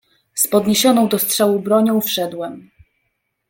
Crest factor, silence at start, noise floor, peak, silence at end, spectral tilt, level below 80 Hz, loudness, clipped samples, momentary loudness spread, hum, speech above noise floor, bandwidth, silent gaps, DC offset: 16 dB; 0.35 s; -71 dBFS; -2 dBFS; 0.9 s; -3.5 dB/octave; -60 dBFS; -16 LUFS; under 0.1%; 13 LU; none; 55 dB; 17 kHz; none; under 0.1%